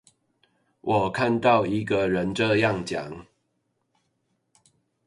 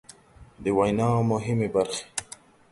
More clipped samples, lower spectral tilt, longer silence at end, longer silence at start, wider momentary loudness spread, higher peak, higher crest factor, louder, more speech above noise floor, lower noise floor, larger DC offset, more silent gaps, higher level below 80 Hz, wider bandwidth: neither; about the same, -6 dB/octave vs -6 dB/octave; first, 1.85 s vs 0.5 s; first, 0.85 s vs 0.4 s; about the same, 13 LU vs 12 LU; about the same, -6 dBFS vs -8 dBFS; about the same, 20 dB vs 18 dB; about the same, -24 LUFS vs -26 LUFS; first, 51 dB vs 27 dB; first, -74 dBFS vs -51 dBFS; neither; neither; about the same, -56 dBFS vs -54 dBFS; about the same, 11.5 kHz vs 11.5 kHz